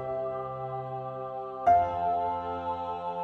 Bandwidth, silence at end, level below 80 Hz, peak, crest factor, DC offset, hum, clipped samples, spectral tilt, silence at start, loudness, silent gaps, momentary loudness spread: 6.2 kHz; 0 s; -58 dBFS; -12 dBFS; 18 dB; under 0.1%; none; under 0.1%; -8 dB/octave; 0 s; -30 LUFS; none; 12 LU